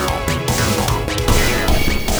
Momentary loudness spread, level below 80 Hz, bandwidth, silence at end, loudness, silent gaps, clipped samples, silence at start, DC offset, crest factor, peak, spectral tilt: 3 LU; -22 dBFS; over 20 kHz; 0 s; -17 LUFS; none; under 0.1%; 0 s; under 0.1%; 16 dB; 0 dBFS; -4 dB/octave